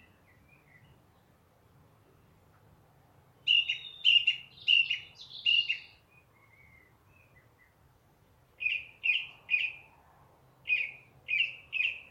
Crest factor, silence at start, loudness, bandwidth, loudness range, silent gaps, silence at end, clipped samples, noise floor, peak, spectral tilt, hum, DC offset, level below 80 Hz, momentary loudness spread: 24 dB; 3.45 s; -28 LUFS; 14 kHz; 9 LU; none; 0.1 s; under 0.1%; -65 dBFS; -10 dBFS; 0 dB/octave; none; under 0.1%; -72 dBFS; 12 LU